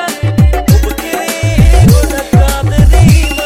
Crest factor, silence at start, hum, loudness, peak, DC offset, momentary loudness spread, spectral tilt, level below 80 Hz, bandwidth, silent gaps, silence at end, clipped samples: 8 dB; 0 s; none; -9 LUFS; 0 dBFS; under 0.1%; 7 LU; -6 dB/octave; -12 dBFS; 16.5 kHz; none; 0 s; 1%